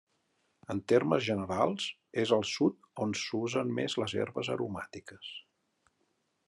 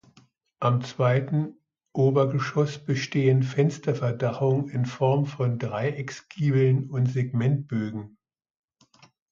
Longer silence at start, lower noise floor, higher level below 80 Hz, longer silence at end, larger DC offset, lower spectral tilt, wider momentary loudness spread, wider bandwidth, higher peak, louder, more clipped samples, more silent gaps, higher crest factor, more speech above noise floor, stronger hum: about the same, 0.7 s vs 0.6 s; first, -77 dBFS vs -60 dBFS; second, -76 dBFS vs -64 dBFS; second, 1.05 s vs 1.25 s; neither; second, -5 dB/octave vs -7.5 dB/octave; first, 16 LU vs 8 LU; first, 11.5 kHz vs 7.4 kHz; second, -12 dBFS vs -8 dBFS; second, -32 LUFS vs -25 LUFS; neither; neither; about the same, 20 dB vs 16 dB; first, 45 dB vs 36 dB; neither